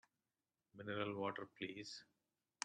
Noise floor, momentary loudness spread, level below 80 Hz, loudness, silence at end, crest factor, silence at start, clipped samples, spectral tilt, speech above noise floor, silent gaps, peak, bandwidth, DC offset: under -90 dBFS; 12 LU; -88 dBFS; -47 LUFS; 0.6 s; 28 dB; 0.75 s; under 0.1%; -4 dB/octave; over 43 dB; none; -22 dBFS; 10.5 kHz; under 0.1%